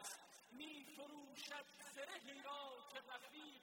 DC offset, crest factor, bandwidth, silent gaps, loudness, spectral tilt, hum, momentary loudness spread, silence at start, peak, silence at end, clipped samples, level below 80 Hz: under 0.1%; 18 dB; 16.5 kHz; none; -54 LUFS; -1 dB/octave; none; 5 LU; 0 s; -38 dBFS; 0 s; under 0.1%; under -90 dBFS